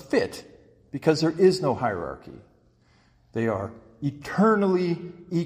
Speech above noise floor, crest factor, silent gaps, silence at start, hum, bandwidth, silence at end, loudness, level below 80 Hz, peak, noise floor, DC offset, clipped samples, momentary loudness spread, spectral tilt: 36 dB; 18 dB; none; 0 s; none; 15 kHz; 0 s; -25 LUFS; -58 dBFS; -8 dBFS; -61 dBFS; under 0.1%; under 0.1%; 16 LU; -6.5 dB/octave